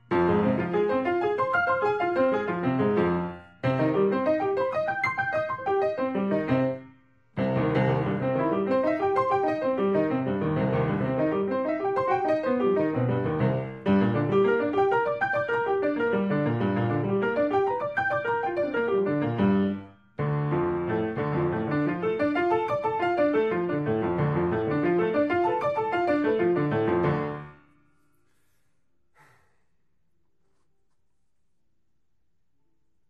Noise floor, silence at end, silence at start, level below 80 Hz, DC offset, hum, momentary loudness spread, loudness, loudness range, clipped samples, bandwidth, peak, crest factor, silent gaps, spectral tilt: -78 dBFS; 5.55 s; 0.1 s; -58 dBFS; under 0.1%; none; 4 LU; -26 LUFS; 2 LU; under 0.1%; 7 kHz; -12 dBFS; 14 dB; none; -9 dB/octave